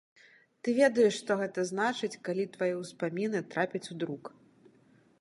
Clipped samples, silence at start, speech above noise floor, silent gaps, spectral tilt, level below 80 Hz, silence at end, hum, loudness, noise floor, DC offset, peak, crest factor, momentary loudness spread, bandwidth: under 0.1%; 0.65 s; 33 dB; none; -5 dB/octave; -82 dBFS; 0.95 s; none; -31 LUFS; -64 dBFS; under 0.1%; -12 dBFS; 20 dB; 12 LU; 11.5 kHz